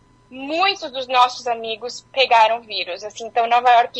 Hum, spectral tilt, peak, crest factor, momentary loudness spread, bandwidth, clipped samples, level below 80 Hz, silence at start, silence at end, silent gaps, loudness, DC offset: none; -1.5 dB/octave; -2 dBFS; 18 dB; 13 LU; 8.6 kHz; under 0.1%; -64 dBFS; 0.3 s; 0 s; none; -19 LUFS; under 0.1%